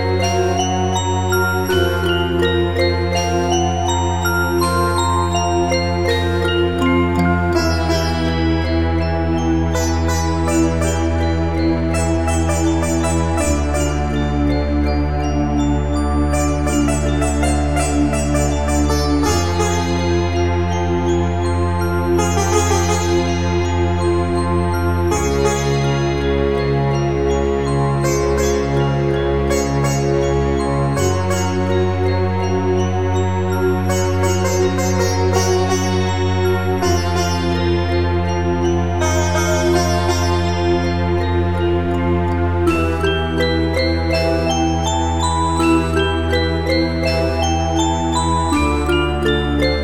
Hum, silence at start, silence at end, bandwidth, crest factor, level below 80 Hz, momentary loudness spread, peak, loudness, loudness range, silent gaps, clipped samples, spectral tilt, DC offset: none; 0 s; 0 s; 16 kHz; 14 dB; -26 dBFS; 2 LU; -2 dBFS; -17 LUFS; 1 LU; none; under 0.1%; -5.5 dB/octave; 3%